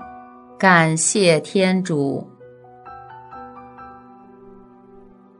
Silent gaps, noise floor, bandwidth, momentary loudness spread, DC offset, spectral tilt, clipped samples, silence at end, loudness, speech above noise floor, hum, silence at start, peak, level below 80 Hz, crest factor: none; -46 dBFS; 10.5 kHz; 26 LU; under 0.1%; -4 dB/octave; under 0.1%; 1.45 s; -17 LUFS; 30 dB; none; 0 s; 0 dBFS; -62 dBFS; 22 dB